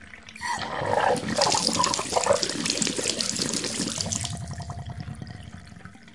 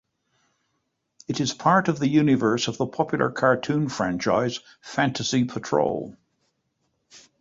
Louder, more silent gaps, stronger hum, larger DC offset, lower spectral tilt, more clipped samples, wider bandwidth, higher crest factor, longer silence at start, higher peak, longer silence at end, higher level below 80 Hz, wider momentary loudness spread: about the same, -25 LUFS vs -23 LUFS; neither; neither; first, 0.2% vs under 0.1%; second, -2.5 dB/octave vs -5.5 dB/octave; neither; first, 11.5 kHz vs 7.8 kHz; about the same, 24 dB vs 20 dB; second, 0 s vs 1.3 s; about the same, -4 dBFS vs -6 dBFS; second, 0 s vs 0.2 s; first, -54 dBFS vs -60 dBFS; first, 19 LU vs 11 LU